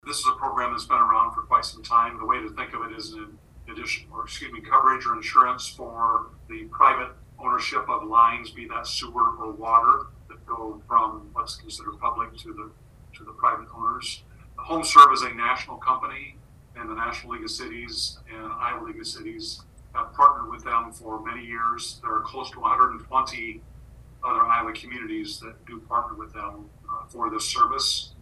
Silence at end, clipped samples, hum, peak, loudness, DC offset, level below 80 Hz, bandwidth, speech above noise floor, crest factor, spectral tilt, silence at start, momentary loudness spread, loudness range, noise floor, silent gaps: 0.1 s; under 0.1%; none; 0 dBFS; -23 LUFS; under 0.1%; -50 dBFS; 12.5 kHz; 22 dB; 24 dB; -2.5 dB/octave; 0.05 s; 17 LU; 9 LU; -47 dBFS; none